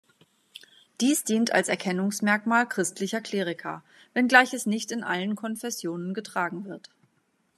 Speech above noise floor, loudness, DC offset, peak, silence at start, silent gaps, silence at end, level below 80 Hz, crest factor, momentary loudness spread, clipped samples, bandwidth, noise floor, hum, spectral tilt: 44 dB; -26 LUFS; under 0.1%; -2 dBFS; 1 s; none; 0.8 s; -82 dBFS; 26 dB; 14 LU; under 0.1%; 14 kHz; -70 dBFS; none; -3.5 dB/octave